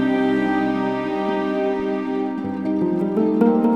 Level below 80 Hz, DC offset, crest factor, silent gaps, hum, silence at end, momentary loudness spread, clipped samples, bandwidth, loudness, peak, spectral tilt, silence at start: -54 dBFS; 0.1%; 16 dB; none; none; 0 s; 7 LU; under 0.1%; 8.2 kHz; -21 LUFS; -4 dBFS; -8 dB/octave; 0 s